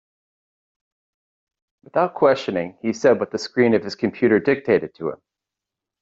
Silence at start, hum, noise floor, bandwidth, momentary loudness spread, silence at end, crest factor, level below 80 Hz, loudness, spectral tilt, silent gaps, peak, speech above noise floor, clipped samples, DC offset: 1.95 s; none; -86 dBFS; 7.8 kHz; 8 LU; 0.85 s; 18 dB; -64 dBFS; -20 LUFS; -6 dB/octave; none; -4 dBFS; 66 dB; under 0.1%; under 0.1%